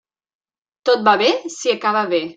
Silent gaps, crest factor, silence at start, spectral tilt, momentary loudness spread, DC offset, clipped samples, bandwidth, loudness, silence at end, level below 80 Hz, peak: none; 18 dB; 0.85 s; -3 dB/octave; 7 LU; under 0.1%; under 0.1%; 9.2 kHz; -17 LUFS; 0.05 s; -70 dBFS; -2 dBFS